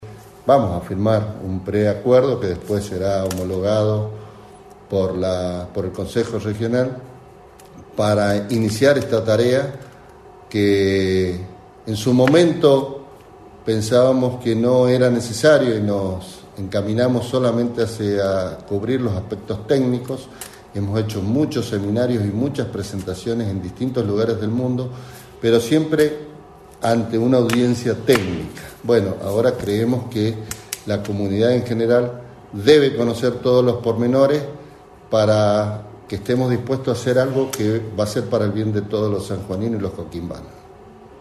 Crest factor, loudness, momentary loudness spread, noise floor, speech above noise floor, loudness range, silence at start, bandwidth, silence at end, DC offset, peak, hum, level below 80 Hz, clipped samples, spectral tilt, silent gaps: 18 dB; -19 LUFS; 14 LU; -43 dBFS; 25 dB; 5 LU; 0 s; 13.5 kHz; 0.05 s; under 0.1%; 0 dBFS; none; -50 dBFS; under 0.1%; -6.5 dB/octave; none